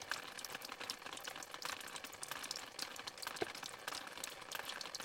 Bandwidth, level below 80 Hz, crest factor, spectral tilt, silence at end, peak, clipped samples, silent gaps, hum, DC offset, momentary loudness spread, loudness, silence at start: 17 kHz; -80 dBFS; 24 dB; -0.5 dB/octave; 0 s; -24 dBFS; under 0.1%; none; none; under 0.1%; 3 LU; -46 LUFS; 0 s